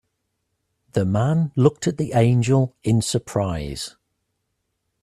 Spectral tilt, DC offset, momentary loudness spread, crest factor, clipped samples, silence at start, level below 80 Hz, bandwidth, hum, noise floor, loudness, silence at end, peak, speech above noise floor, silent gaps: -6.5 dB/octave; under 0.1%; 10 LU; 20 dB; under 0.1%; 0.95 s; -48 dBFS; 13 kHz; none; -75 dBFS; -21 LUFS; 1.15 s; -2 dBFS; 56 dB; none